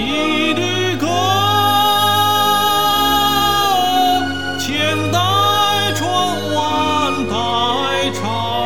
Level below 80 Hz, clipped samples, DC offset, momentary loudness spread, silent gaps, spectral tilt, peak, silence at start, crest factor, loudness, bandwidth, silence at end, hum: -42 dBFS; under 0.1%; 2%; 5 LU; none; -3.5 dB/octave; -2 dBFS; 0 s; 14 dB; -15 LUFS; 19.5 kHz; 0 s; none